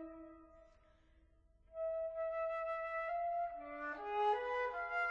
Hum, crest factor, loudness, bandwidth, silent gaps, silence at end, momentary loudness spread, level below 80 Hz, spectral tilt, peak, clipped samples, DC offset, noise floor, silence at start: 50 Hz at -75 dBFS; 16 dB; -40 LUFS; 7.4 kHz; none; 0 s; 12 LU; -70 dBFS; -4.5 dB/octave; -26 dBFS; under 0.1%; under 0.1%; -69 dBFS; 0 s